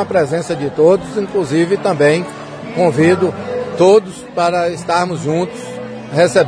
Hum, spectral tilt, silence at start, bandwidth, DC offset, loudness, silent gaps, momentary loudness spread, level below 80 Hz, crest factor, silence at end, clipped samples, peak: none; -6 dB/octave; 0 s; 10.5 kHz; under 0.1%; -15 LUFS; none; 13 LU; -52 dBFS; 14 dB; 0 s; under 0.1%; 0 dBFS